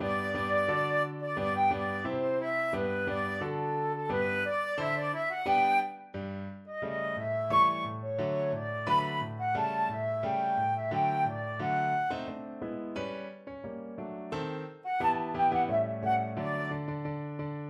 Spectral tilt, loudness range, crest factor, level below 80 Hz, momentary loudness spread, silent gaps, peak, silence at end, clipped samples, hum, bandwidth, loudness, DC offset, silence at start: -7 dB/octave; 4 LU; 16 dB; -62 dBFS; 11 LU; none; -16 dBFS; 0 s; under 0.1%; none; 12.5 kHz; -31 LUFS; under 0.1%; 0 s